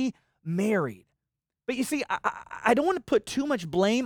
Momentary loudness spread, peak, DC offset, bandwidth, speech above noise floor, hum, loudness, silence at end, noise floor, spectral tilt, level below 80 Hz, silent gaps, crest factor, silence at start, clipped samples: 9 LU; -8 dBFS; under 0.1%; over 20 kHz; 61 dB; none; -28 LUFS; 0 s; -87 dBFS; -5 dB/octave; -62 dBFS; none; 20 dB; 0 s; under 0.1%